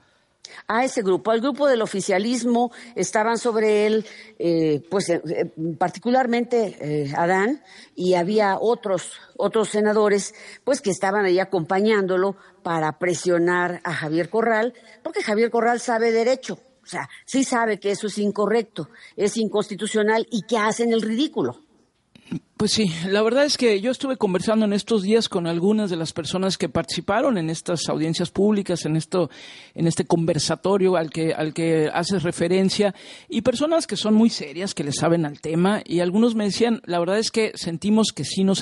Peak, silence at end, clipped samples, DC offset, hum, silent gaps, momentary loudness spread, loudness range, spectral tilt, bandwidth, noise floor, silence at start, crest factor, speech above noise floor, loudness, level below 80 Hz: -6 dBFS; 0 s; under 0.1%; under 0.1%; none; none; 8 LU; 2 LU; -5 dB/octave; 11.5 kHz; -57 dBFS; 0.5 s; 16 dB; 35 dB; -22 LUFS; -62 dBFS